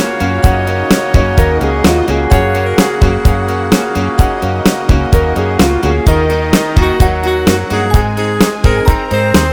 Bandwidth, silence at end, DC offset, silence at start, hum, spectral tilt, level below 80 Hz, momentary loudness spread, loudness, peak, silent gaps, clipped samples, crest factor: over 20 kHz; 0 s; under 0.1%; 0 s; none; -6 dB/octave; -16 dBFS; 2 LU; -12 LUFS; 0 dBFS; none; 0.8%; 10 dB